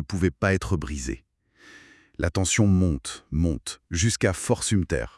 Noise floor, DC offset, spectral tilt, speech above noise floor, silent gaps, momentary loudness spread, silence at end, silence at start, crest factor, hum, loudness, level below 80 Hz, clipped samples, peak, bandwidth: -54 dBFS; under 0.1%; -5 dB/octave; 30 dB; none; 11 LU; 0.1 s; 0 s; 20 dB; none; -25 LUFS; -40 dBFS; under 0.1%; -6 dBFS; 12 kHz